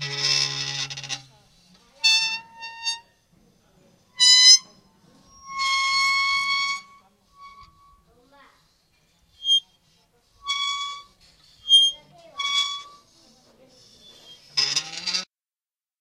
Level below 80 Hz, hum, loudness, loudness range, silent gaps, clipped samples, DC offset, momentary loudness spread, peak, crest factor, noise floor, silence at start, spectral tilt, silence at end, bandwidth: -68 dBFS; none; -19 LUFS; 11 LU; none; under 0.1%; under 0.1%; 20 LU; 0 dBFS; 26 dB; under -90 dBFS; 0 s; 2 dB/octave; 0.75 s; 16 kHz